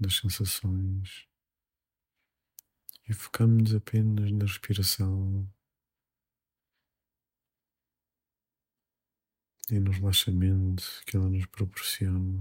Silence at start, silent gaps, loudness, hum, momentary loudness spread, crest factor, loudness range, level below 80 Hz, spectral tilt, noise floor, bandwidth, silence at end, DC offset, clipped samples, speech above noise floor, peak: 0 s; none; -28 LUFS; none; 12 LU; 18 dB; 9 LU; -56 dBFS; -5 dB/octave; under -90 dBFS; 16.5 kHz; 0 s; under 0.1%; under 0.1%; over 63 dB; -12 dBFS